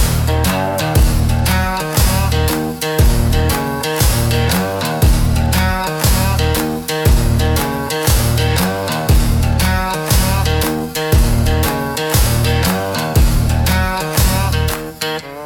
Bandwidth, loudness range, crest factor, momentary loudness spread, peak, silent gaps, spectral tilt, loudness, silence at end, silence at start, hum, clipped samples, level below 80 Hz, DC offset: 17.5 kHz; 0 LU; 14 dB; 4 LU; 0 dBFS; none; -4.5 dB/octave; -15 LUFS; 0 s; 0 s; none; under 0.1%; -20 dBFS; under 0.1%